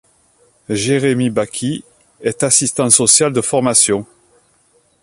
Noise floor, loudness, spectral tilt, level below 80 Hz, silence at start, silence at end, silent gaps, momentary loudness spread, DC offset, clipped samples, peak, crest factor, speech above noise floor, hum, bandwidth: -57 dBFS; -14 LUFS; -3 dB/octave; -54 dBFS; 0.7 s; 1 s; none; 13 LU; under 0.1%; under 0.1%; 0 dBFS; 16 dB; 42 dB; none; 16 kHz